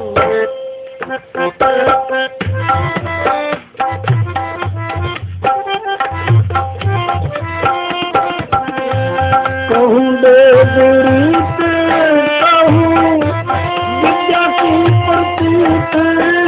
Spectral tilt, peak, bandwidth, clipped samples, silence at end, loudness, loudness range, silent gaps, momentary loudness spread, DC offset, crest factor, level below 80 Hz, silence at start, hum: -10.5 dB/octave; 0 dBFS; 4 kHz; under 0.1%; 0 s; -12 LUFS; 8 LU; none; 11 LU; under 0.1%; 12 dB; -34 dBFS; 0 s; none